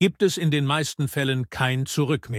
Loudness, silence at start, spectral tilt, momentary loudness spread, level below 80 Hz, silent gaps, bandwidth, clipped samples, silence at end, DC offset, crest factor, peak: -24 LUFS; 0 s; -5 dB/octave; 4 LU; -56 dBFS; none; 16 kHz; under 0.1%; 0 s; under 0.1%; 16 dB; -8 dBFS